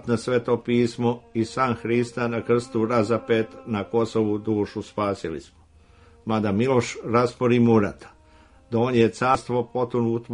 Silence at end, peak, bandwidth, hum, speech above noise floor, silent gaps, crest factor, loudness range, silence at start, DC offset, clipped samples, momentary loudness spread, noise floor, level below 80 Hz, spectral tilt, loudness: 0 s; -4 dBFS; 10.5 kHz; none; 30 dB; none; 18 dB; 4 LU; 0.05 s; under 0.1%; under 0.1%; 8 LU; -53 dBFS; -56 dBFS; -7 dB/octave; -23 LUFS